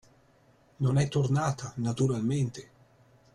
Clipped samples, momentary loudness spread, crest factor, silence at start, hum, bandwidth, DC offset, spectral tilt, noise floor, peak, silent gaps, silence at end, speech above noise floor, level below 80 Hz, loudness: under 0.1%; 7 LU; 14 dB; 0.8 s; none; 11 kHz; under 0.1%; -7 dB/octave; -62 dBFS; -16 dBFS; none; 0.7 s; 35 dB; -60 dBFS; -29 LUFS